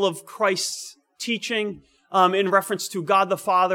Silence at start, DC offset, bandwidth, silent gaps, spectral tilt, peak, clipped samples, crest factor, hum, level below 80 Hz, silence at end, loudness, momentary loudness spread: 0 s; under 0.1%; 18.5 kHz; none; -3 dB/octave; -4 dBFS; under 0.1%; 20 dB; none; -72 dBFS; 0 s; -22 LUFS; 13 LU